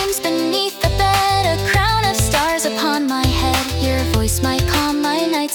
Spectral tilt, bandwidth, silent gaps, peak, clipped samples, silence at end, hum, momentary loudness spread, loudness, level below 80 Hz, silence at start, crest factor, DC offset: -4 dB/octave; 19 kHz; none; -4 dBFS; under 0.1%; 0 s; none; 3 LU; -17 LUFS; -28 dBFS; 0 s; 12 dB; under 0.1%